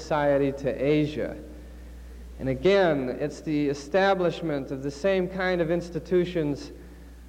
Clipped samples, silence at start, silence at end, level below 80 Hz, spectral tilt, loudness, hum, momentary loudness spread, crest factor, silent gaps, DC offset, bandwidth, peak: under 0.1%; 0 s; 0 s; -46 dBFS; -6.5 dB/octave; -26 LUFS; none; 22 LU; 14 dB; none; under 0.1%; 15.5 kHz; -12 dBFS